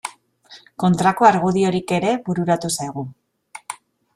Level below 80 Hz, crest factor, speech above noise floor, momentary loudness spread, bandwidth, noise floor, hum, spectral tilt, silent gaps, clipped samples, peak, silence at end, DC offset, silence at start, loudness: -58 dBFS; 20 dB; 30 dB; 21 LU; 13.5 kHz; -48 dBFS; none; -5.5 dB/octave; none; under 0.1%; -2 dBFS; 0.4 s; under 0.1%; 0.05 s; -19 LUFS